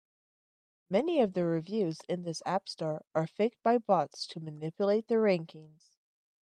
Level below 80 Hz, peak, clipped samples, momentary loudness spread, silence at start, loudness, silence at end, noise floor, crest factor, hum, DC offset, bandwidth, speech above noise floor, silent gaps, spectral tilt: -80 dBFS; -14 dBFS; under 0.1%; 10 LU; 0.9 s; -31 LUFS; 0.75 s; under -90 dBFS; 18 dB; none; under 0.1%; 10.5 kHz; over 59 dB; none; -6.5 dB/octave